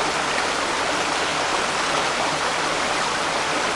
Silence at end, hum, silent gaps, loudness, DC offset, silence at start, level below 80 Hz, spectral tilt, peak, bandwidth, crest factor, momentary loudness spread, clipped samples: 0 s; none; none; -21 LUFS; under 0.1%; 0 s; -52 dBFS; -1.5 dB/octave; -6 dBFS; 11.5 kHz; 16 dB; 1 LU; under 0.1%